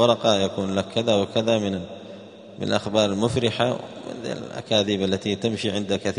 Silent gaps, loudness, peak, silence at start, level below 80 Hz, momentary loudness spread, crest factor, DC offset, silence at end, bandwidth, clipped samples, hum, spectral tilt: none; -23 LUFS; -4 dBFS; 0 s; -58 dBFS; 13 LU; 20 dB; under 0.1%; 0 s; 10.5 kHz; under 0.1%; none; -5 dB/octave